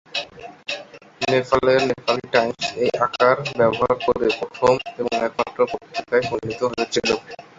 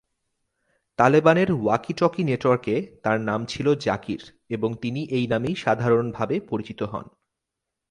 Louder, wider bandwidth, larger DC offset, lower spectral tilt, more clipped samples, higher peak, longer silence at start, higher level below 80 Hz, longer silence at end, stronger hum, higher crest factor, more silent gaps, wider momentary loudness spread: about the same, -21 LUFS vs -23 LUFS; second, 7.8 kHz vs 11 kHz; neither; second, -4.5 dB/octave vs -7 dB/octave; neither; about the same, -2 dBFS vs -2 dBFS; second, 0.15 s vs 1 s; about the same, -54 dBFS vs -58 dBFS; second, 0.15 s vs 0.85 s; neither; about the same, 20 dB vs 22 dB; neither; about the same, 10 LU vs 12 LU